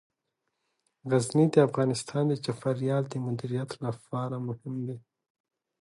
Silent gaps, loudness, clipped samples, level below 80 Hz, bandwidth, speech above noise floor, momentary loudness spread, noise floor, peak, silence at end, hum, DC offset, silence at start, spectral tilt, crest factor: none; -29 LUFS; under 0.1%; -70 dBFS; 11.5 kHz; 54 dB; 13 LU; -82 dBFS; -8 dBFS; 0.85 s; none; under 0.1%; 1.05 s; -6.5 dB/octave; 22 dB